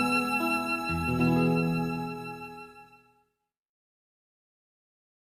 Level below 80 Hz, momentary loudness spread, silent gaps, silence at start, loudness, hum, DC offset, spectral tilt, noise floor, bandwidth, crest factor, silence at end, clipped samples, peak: -58 dBFS; 17 LU; none; 0 s; -28 LUFS; none; under 0.1%; -6 dB/octave; -80 dBFS; 15.5 kHz; 18 dB; 2.45 s; under 0.1%; -14 dBFS